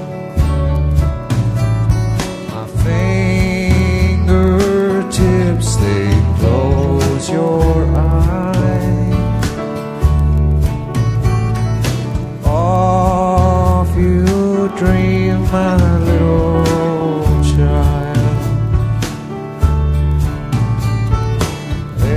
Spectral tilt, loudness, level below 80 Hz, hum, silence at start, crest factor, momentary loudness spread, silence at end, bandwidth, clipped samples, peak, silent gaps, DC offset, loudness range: -7 dB/octave; -15 LUFS; -18 dBFS; none; 0 s; 12 dB; 5 LU; 0 s; 15 kHz; under 0.1%; 0 dBFS; none; under 0.1%; 3 LU